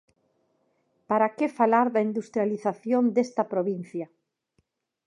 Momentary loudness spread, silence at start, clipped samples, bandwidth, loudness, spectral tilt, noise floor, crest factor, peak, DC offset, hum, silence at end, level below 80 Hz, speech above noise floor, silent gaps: 11 LU; 1.1 s; under 0.1%; 10.5 kHz; -25 LUFS; -7.5 dB/octave; -73 dBFS; 20 dB; -8 dBFS; under 0.1%; none; 1 s; -82 dBFS; 48 dB; none